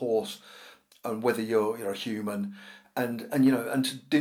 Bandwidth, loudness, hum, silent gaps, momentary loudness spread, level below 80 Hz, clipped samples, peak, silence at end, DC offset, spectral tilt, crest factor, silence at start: 18 kHz; -29 LUFS; none; none; 17 LU; -82 dBFS; under 0.1%; -12 dBFS; 0 s; under 0.1%; -5.5 dB/octave; 18 dB; 0 s